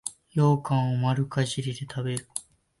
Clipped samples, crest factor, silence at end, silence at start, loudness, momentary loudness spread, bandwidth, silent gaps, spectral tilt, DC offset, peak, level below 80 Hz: under 0.1%; 18 dB; 0.4 s; 0.05 s; -27 LUFS; 10 LU; 11.5 kHz; none; -6 dB/octave; under 0.1%; -8 dBFS; -62 dBFS